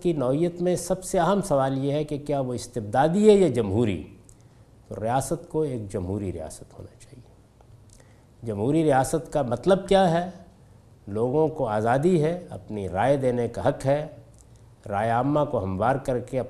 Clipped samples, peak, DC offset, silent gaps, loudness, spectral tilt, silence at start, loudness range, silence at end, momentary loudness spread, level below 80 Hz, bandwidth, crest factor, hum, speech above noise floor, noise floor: under 0.1%; -6 dBFS; under 0.1%; none; -24 LUFS; -6.5 dB/octave; 0 s; 8 LU; 0 s; 14 LU; -48 dBFS; 14 kHz; 20 dB; none; 29 dB; -53 dBFS